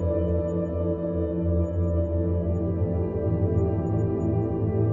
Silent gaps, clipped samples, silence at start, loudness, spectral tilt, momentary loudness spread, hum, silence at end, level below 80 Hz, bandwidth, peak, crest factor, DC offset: none; under 0.1%; 0 s; -26 LUFS; -12 dB/octave; 3 LU; none; 0 s; -40 dBFS; 3.2 kHz; -12 dBFS; 12 dB; under 0.1%